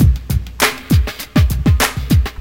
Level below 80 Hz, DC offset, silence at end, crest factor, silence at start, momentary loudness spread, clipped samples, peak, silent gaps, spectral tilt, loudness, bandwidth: -18 dBFS; under 0.1%; 0 s; 14 dB; 0 s; 4 LU; under 0.1%; 0 dBFS; none; -5 dB/octave; -16 LUFS; 17.5 kHz